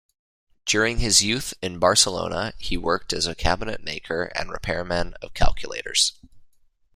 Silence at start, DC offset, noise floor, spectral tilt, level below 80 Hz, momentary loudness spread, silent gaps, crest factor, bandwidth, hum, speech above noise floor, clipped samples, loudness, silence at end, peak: 0.65 s; under 0.1%; -58 dBFS; -2 dB/octave; -34 dBFS; 12 LU; none; 22 dB; 15.5 kHz; none; 35 dB; under 0.1%; -23 LUFS; 0.5 s; -2 dBFS